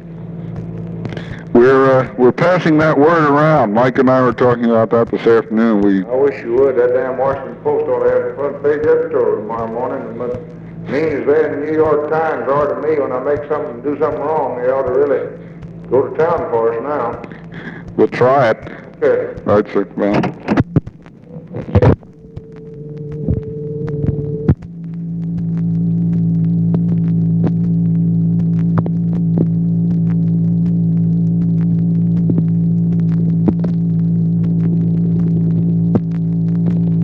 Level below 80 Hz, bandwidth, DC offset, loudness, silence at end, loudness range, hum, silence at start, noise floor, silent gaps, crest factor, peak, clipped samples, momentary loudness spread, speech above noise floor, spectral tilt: -40 dBFS; 6 kHz; under 0.1%; -15 LUFS; 0 s; 6 LU; none; 0 s; -35 dBFS; none; 14 dB; 0 dBFS; under 0.1%; 14 LU; 21 dB; -10 dB/octave